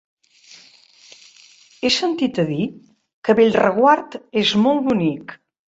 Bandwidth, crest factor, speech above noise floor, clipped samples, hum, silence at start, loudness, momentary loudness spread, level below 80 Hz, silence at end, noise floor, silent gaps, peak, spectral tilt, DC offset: 8 kHz; 18 dB; 32 dB; under 0.1%; none; 1.85 s; -18 LUFS; 11 LU; -60 dBFS; 0.3 s; -49 dBFS; 3.14-3.22 s; -2 dBFS; -5 dB/octave; under 0.1%